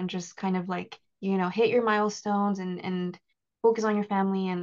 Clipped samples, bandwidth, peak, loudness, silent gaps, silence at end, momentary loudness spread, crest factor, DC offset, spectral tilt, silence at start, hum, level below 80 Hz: under 0.1%; 7.4 kHz; -12 dBFS; -28 LUFS; none; 0 s; 10 LU; 16 dB; under 0.1%; -6 dB/octave; 0 s; none; -76 dBFS